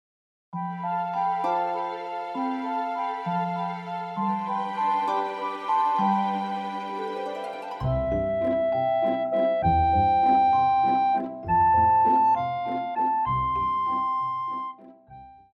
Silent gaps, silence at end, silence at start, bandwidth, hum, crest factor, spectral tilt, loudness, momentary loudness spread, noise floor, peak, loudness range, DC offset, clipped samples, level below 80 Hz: none; 0.2 s; 0.55 s; 7.6 kHz; none; 14 dB; -8 dB/octave; -25 LUFS; 12 LU; -48 dBFS; -12 dBFS; 7 LU; under 0.1%; under 0.1%; -46 dBFS